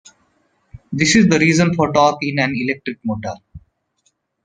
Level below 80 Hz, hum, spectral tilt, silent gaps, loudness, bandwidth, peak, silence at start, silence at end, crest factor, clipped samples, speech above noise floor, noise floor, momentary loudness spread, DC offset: -50 dBFS; none; -5 dB/octave; none; -16 LUFS; 9.6 kHz; 0 dBFS; 0.75 s; 0.85 s; 18 dB; under 0.1%; 50 dB; -65 dBFS; 15 LU; under 0.1%